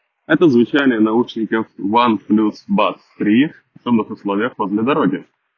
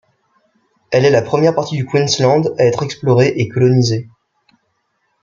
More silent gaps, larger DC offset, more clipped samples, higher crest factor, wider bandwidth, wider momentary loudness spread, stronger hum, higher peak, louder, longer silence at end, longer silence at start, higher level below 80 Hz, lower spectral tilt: neither; neither; neither; about the same, 16 dB vs 14 dB; second, 6.6 kHz vs 7.4 kHz; about the same, 7 LU vs 6 LU; neither; about the same, -2 dBFS vs 0 dBFS; second, -17 LUFS vs -14 LUFS; second, 0.35 s vs 1.15 s; second, 0.3 s vs 0.9 s; second, -62 dBFS vs -54 dBFS; first, -8 dB/octave vs -6 dB/octave